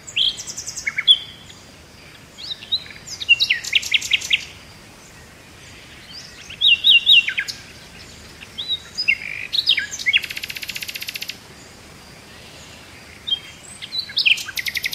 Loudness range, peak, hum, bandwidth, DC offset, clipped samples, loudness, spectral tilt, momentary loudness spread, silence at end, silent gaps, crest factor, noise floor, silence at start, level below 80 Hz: 9 LU; -2 dBFS; none; 16 kHz; under 0.1%; under 0.1%; -17 LUFS; 1 dB/octave; 26 LU; 0 s; none; 20 dB; -43 dBFS; 0.05 s; -54 dBFS